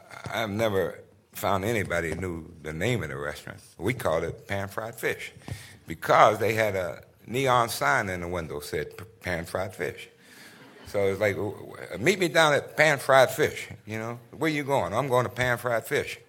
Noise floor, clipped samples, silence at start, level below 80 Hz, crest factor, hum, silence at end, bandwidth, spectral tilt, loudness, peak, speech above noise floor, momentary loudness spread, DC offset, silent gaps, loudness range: -50 dBFS; under 0.1%; 0.1 s; -56 dBFS; 24 dB; none; 0.1 s; 17 kHz; -4.5 dB/octave; -26 LUFS; -2 dBFS; 24 dB; 17 LU; under 0.1%; none; 7 LU